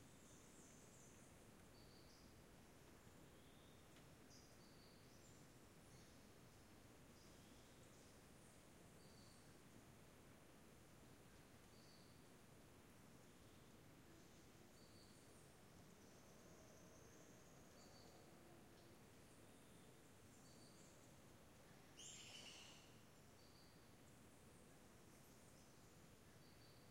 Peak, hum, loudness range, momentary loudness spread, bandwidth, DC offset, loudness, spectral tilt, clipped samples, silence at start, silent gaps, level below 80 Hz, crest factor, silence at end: -48 dBFS; none; 4 LU; 2 LU; 16 kHz; under 0.1%; -66 LUFS; -3.5 dB/octave; under 0.1%; 0 s; none; -80 dBFS; 20 dB; 0 s